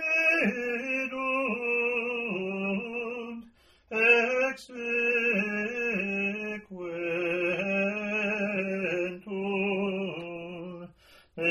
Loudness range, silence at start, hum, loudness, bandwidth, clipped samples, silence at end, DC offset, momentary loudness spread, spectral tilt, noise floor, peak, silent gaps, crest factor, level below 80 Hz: 4 LU; 0 s; none; -28 LUFS; 13 kHz; under 0.1%; 0 s; under 0.1%; 15 LU; -5.5 dB/octave; -57 dBFS; -8 dBFS; none; 22 dB; -68 dBFS